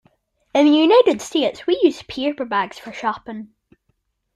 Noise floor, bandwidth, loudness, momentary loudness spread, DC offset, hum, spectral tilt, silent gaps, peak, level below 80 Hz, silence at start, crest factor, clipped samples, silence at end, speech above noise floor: -69 dBFS; 12 kHz; -18 LUFS; 15 LU; under 0.1%; none; -4 dB/octave; none; -2 dBFS; -60 dBFS; 0.55 s; 18 dB; under 0.1%; 0.9 s; 51 dB